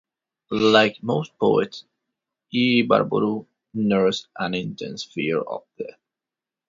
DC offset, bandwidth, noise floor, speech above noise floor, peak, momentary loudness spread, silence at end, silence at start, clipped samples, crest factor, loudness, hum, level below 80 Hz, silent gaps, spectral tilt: under 0.1%; 7.6 kHz; -89 dBFS; 67 dB; -2 dBFS; 15 LU; 0.8 s; 0.5 s; under 0.1%; 20 dB; -22 LUFS; none; -62 dBFS; none; -5.5 dB/octave